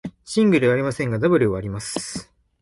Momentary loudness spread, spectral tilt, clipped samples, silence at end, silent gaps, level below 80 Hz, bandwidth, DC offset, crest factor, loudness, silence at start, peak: 12 LU; -6 dB/octave; under 0.1%; 0.4 s; none; -50 dBFS; 11.5 kHz; under 0.1%; 16 dB; -21 LUFS; 0.05 s; -6 dBFS